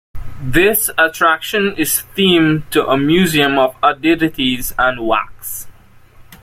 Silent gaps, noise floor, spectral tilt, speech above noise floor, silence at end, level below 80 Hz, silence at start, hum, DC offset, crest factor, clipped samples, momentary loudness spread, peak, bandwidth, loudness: none; -43 dBFS; -4 dB/octave; 28 dB; 0.1 s; -36 dBFS; 0.15 s; none; under 0.1%; 14 dB; under 0.1%; 6 LU; 0 dBFS; 16.5 kHz; -14 LUFS